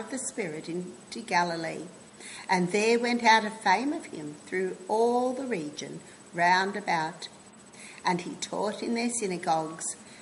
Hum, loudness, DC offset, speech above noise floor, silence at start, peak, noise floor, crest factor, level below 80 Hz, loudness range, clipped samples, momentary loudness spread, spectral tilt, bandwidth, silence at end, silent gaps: none; -28 LUFS; under 0.1%; 21 dB; 0 s; -8 dBFS; -49 dBFS; 20 dB; -74 dBFS; 4 LU; under 0.1%; 17 LU; -3.5 dB/octave; 11.5 kHz; 0 s; none